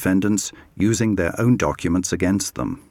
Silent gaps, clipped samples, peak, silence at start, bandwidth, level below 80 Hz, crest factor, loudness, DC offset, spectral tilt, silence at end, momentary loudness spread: none; under 0.1%; -6 dBFS; 0 s; 16.5 kHz; -44 dBFS; 14 dB; -21 LUFS; under 0.1%; -5.5 dB/octave; 0.1 s; 6 LU